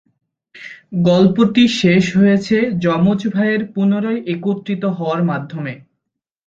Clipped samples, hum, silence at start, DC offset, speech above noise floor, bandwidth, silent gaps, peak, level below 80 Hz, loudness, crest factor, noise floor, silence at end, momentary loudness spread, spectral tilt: under 0.1%; none; 0.55 s; under 0.1%; 63 dB; 7.8 kHz; none; -2 dBFS; -54 dBFS; -16 LUFS; 16 dB; -79 dBFS; 0.7 s; 14 LU; -7 dB/octave